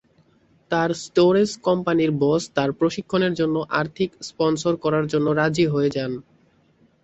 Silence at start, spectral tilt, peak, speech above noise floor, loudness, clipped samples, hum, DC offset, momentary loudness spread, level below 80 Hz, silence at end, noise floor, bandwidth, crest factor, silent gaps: 0.7 s; -6 dB/octave; -6 dBFS; 38 dB; -22 LUFS; under 0.1%; none; under 0.1%; 7 LU; -58 dBFS; 0.8 s; -59 dBFS; 8.2 kHz; 16 dB; none